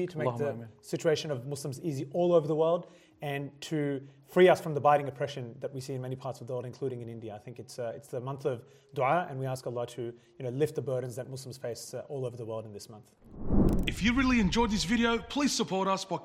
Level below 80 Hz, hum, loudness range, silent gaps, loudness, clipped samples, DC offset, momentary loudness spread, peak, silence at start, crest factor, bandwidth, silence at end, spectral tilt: -44 dBFS; none; 8 LU; none; -31 LUFS; under 0.1%; under 0.1%; 15 LU; -10 dBFS; 0 s; 20 dB; 16 kHz; 0 s; -5.5 dB/octave